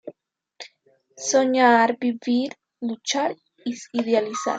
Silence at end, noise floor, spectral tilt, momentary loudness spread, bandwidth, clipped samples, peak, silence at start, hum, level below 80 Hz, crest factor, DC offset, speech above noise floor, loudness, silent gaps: 0 s; -63 dBFS; -2.5 dB/octave; 25 LU; 9.2 kHz; under 0.1%; -4 dBFS; 0.05 s; none; -78 dBFS; 18 dB; under 0.1%; 41 dB; -22 LUFS; none